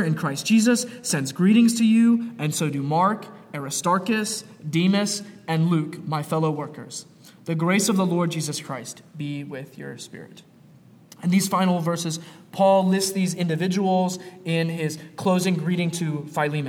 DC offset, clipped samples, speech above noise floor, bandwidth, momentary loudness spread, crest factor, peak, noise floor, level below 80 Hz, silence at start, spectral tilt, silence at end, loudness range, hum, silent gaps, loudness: under 0.1%; under 0.1%; 28 dB; 17 kHz; 16 LU; 16 dB; -8 dBFS; -51 dBFS; -72 dBFS; 0 s; -5 dB/octave; 0 s; 6 LU; none; none; -23 LUFS